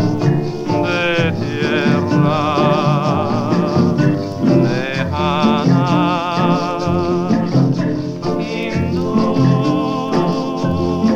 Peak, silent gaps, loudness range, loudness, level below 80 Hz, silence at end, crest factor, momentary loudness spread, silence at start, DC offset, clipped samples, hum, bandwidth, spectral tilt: 0 dBFS; none; 2 LU; -16 LUFS; -44 dBFS; 0 s; 14 dB; 5 LU; 0 s; under 0.1%; under 0.1%; none; 8 kHz; -7.5 dB/octave